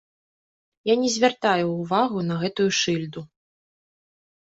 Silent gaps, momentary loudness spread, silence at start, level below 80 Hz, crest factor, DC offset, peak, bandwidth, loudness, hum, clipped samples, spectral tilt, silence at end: none; 9 LU; 0.85 s; -66 dBFS; 18 dB; under 0.1%; -6 dBFS; 8 kHz; -23 LUFS; none; under 0.1%; -4.5 dB/octave; 1.15 s